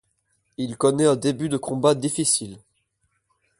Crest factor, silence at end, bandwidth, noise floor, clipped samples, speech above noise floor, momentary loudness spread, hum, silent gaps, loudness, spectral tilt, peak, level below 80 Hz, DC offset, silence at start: 20 dB; 1 s; 11.5 kHz; -72 dBFS; under 0.1%; 50 dB; 13 LU; none; none; -22 LUFS; -4.5 dB/octave; -6 dBFS; -62 dBFS; under 0.1%; 0.6 s